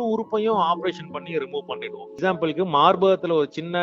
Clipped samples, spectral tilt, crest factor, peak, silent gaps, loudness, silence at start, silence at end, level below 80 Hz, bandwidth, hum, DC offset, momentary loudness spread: under 0.1%; -6.5 dB/octave; 20 dB; -4 dBFS; none; -22 LUFS; 0 s; 0 s; -68 dBFS; 7.4 kHz; none; under 0.1%; 14 LU